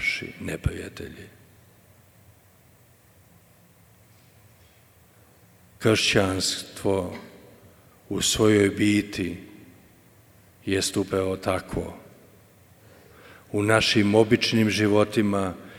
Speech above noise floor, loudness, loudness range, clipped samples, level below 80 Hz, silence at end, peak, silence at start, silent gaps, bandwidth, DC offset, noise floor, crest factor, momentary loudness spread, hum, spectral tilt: 33 dB; -23 LUFS; 8 LU; under 0.1%; -50 dBFS; 0 s; -4 dBFS; 0 s; none; over 20 kHz; under 0.1%; -56 dBFS; 24 dB; 18 LU; none; -4.5 dB/octave